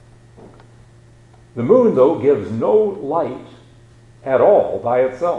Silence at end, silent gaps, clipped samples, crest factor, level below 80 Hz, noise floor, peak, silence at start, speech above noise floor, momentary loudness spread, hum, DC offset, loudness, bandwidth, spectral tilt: 0 s; none; under 0.1%; 16 dB; -54 dBFS; -46 dBFS; 0 dBFS; 1.55 s; 31 dB; 13 LU; none; under 0.1%; -16 LUFS; 7.8 kHz; -8.5 dB/octave